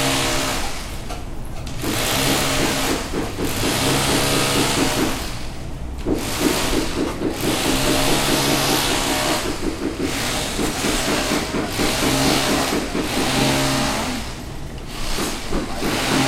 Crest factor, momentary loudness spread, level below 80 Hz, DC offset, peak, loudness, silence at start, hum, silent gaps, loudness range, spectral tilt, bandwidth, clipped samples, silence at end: 16 dB; 13 LU; -30 dBFS; under 0.1%; -4 dBFS; -20 LUFS; 0 s; none; none; 3 LU; -3.5 dB/octave; 16.5 kHz; under 0.1%; 0 s